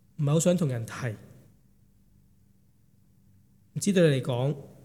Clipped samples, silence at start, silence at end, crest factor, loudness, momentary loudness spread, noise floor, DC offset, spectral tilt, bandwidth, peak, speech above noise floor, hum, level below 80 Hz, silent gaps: under 0.1%; 0.2 s; 0.15 s; 18 dB; -27 LUFS; 13 LU; -63 dBFS; under 0.1%; -6 dB/octave; 15.5 kHz; -10 dBFS; 38 dB; none; -68 dBFS; none